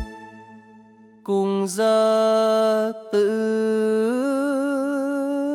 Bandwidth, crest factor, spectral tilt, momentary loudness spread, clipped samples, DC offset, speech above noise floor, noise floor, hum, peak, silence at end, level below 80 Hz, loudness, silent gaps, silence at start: 14.5 kHz; 14 dB; -5.5 dB/octave; 6 LU; under 0.1%; under 0.1%; 30 dB; -49 dBFS; none; -8 dBFS; 0 s; -54 dBFS; -21 LUFS; none; 0 s